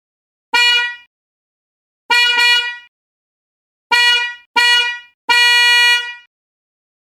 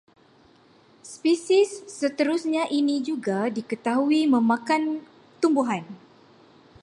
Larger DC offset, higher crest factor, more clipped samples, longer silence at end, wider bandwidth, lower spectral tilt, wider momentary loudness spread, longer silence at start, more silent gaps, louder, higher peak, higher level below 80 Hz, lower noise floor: neither; about the same, 16 dB vs 14 dB; neither; about the same, 0.85 s vs 0.85 s; first, 18 kHz vs 11.5 kHz; second, 3.5 dB/octave vs -5 dB/octave; first, 12 LU vs 9 LU; second, 0.55 s vs 1.05 s; first, 1.07-2.09 s, 2.88-3.90 s, 4.46-4.54 s, 5.14-5.28 s vs none; first, -11 LUFS vs -24 LUFS; first, 0 dBFS vs -10 dBFS; first, -64 dBFS vs -74 dBFS; first, under -90 dBFS vs -56 dBFS